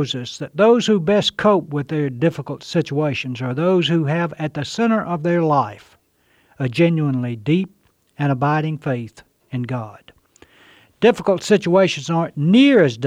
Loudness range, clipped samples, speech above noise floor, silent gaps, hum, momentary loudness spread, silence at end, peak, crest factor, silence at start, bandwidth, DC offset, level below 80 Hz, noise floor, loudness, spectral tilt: 4 LU; under 0.1%; 42 dB; none; none; 12 LU; 0 s; -2 dBFS; 16 dB; 0 s; 11 kHz; under 0.1%; -58 dBFS; -60 dBFS; -18 LUFS; -6.5 dB/octave